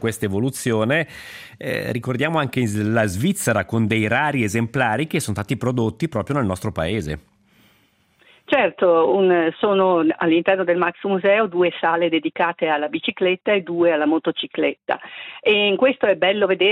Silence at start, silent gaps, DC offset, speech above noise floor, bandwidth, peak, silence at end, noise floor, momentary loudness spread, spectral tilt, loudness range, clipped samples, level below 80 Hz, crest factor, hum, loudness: 0 s; none; under 0.1%; 40 dB; 16 kHz; -4 dBFS; 0 s; -60 dBFS; 8 LU; -5.5 dB/octave; 5 LU; under 0.1%; -54 dBFS; 16 dB; none; -20 LUFS